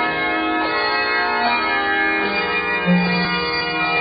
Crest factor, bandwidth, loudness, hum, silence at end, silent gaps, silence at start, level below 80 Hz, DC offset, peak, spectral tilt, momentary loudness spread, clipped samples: 14 dB; 5.2 kHz; -18 LUFS; none; 0 s; none; 0 s; -48 dBFS; under 0.1%; -6 dBFS; -9 dB/octave; 2 LU; under 0.1%